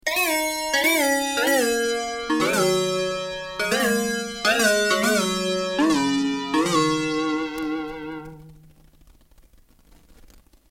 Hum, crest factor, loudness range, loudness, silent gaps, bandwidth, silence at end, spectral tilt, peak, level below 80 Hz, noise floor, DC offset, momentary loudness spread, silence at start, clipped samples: none; 16 dB; 9 LU; -22 LUFS; none; 16.5 kHz; 2.15 s; -3 dB/octave; -6 dBFS; -52 dBFS; -54 dBFS; under 0.1%; 10 LU; 0.05 s; under 0.1%